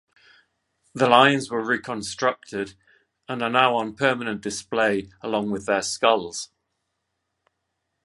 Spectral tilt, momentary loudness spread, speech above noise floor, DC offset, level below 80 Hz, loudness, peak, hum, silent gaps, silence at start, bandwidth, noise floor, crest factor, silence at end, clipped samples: -3.5 dB/octave; 15 LU; 55 dB; under 0.1%; -62 dBFS; -22 LUFS; -2 dBFS; none; none; 0.95 s; 11.5 kHz; -78 dBFS; 24 dB; 1.6 s; under 0.1%